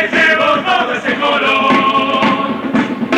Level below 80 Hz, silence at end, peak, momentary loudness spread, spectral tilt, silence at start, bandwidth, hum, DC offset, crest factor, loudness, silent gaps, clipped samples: -52 dBFS; 0 s; -2 dBFS; 6 LU; -4.5 dB/octave; 0 s; 12.5 kHz; none; under 0.1%; 10 dB; -12 LUFS; none; under 0.1%